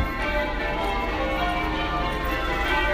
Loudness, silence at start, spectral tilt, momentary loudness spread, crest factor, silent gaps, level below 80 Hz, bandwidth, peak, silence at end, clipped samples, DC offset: -25 LUFS; 0 s; -5.5 dB/octave; 2 LU; 14 dB; none; -30 dBFS; 15.5 kHz; -10 dBFS; 0 s; under 0.1%; under 0.1%